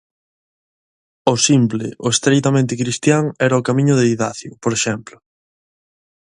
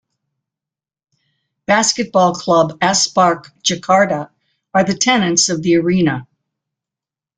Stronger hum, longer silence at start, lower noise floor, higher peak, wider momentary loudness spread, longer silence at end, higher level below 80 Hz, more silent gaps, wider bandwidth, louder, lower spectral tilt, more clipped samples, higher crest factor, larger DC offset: neither; second, 1.25 s vs 1.7 s; about the same, under -90 dBFS vs -88 dBFS; about the same, 0 dBFS vs 0 dBFS; about the same, 8 LU vs 6 LU; first, 1.35 s vs 1.15 s; about the same, -56 dBFS vs -56 dBFS; neither; first, 11.5 kHz vs 10 kHz; about the same, -17 LUFS vs -15 LUFS; about the same, -4.5 dB/octave vs -3.5 dB/octave; neither; about the same, 18 dB vs 16 dB; neither